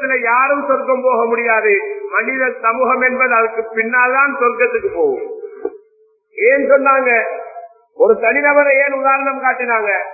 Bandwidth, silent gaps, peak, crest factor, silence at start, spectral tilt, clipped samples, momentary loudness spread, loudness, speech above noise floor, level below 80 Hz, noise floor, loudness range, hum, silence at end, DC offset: 2.7 kHz; none; 0 dBFS; 14 dB; 0 s; -12 dB/octave; under 0.1%; 11 LU; -14 LUFS; 40 dB; -62 dBFS; -55 dBFS; 3 LU; none; 0 s; under 0.1%